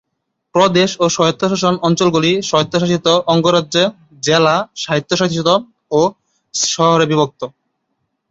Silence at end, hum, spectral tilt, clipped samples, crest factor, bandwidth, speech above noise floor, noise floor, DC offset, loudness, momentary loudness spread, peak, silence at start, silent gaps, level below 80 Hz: 0.8 s; none; -4.5 dB/octave; under 0.1%; 16 dB; 8 kHz; 59 dB; -73 dBFS; under 0.1%; -15 LUFS; 7 LU; 0 dBFS; 0.55 s; none; -54 dBFS